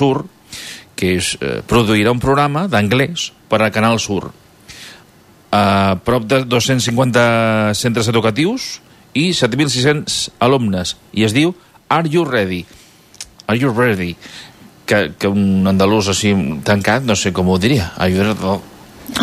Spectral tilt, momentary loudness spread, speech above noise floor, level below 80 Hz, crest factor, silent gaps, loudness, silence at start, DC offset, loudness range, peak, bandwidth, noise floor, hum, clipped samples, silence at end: -5 dB/octave; 14 LU; 32 dB; -44 dBFS; 14 dB; none; -15 LUFS; 0 s; under 0.1%; 3 LU; -2 dBFS; 15.5 kHz; -46 dBFS; none; under 0.1%; 0 s